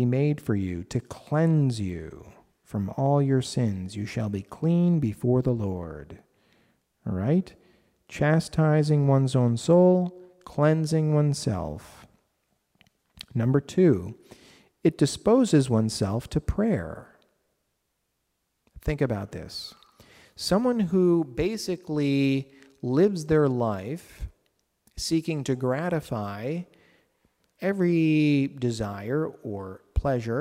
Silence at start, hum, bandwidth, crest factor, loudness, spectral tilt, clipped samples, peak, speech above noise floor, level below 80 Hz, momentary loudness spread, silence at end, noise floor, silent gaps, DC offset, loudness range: 0 s; none; 15 kHz; 16 dB; -25 LUFS; -7 dB/octave; under 0.1%; -10 dBFS; 53 dB; -48 dBFS; 15 LU; 0 s; -77 dBFS; none; under 0.1%; 8 LU